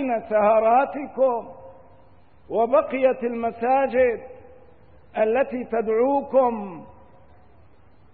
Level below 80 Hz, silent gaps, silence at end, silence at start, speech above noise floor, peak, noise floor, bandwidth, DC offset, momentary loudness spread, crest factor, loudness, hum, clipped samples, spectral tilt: -58 dBFS; none; 1.3 s; 0 s; 34 dB; -8 dBFS; -55 dBFS; 4.2 kHz; 0.3%; 14 LU; 16 dB; -22 LUFS; none; under 0.1%; -10.5 dB/octave